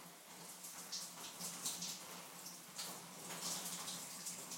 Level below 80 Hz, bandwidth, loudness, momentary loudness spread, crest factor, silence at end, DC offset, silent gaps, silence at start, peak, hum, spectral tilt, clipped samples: -90 dBFS; 16.5 kHz; -46 LUFS; 8 LU; 22 dB; 0 s; under 0.1%; none; 0 s; -28 dBFS; none; -1 dB/octave; under 0.1%